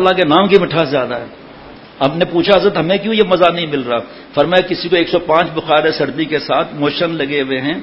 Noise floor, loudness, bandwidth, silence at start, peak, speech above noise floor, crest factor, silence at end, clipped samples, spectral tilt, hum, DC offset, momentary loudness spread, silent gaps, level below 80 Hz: -36 dBFS; -14 LUFS; 8 kHz; 0 s; 0 dBFS; 22 dB; 14 dB; 0 s; 0.1%; -7.5 dB/octave; none; under 0.1%; 7 LU; none; -48 dBFS